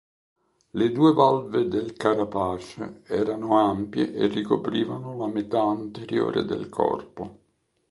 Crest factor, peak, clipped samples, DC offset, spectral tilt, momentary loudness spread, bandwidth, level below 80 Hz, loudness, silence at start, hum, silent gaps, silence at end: 20 dB; -4 dBFS; under 0.1%; under 0.1%; -7.5 dB/octave; 12 LU; 11.5 kHz; -58 dBFS; -24 LUFS; 0.75 s; none; none; 0.55 s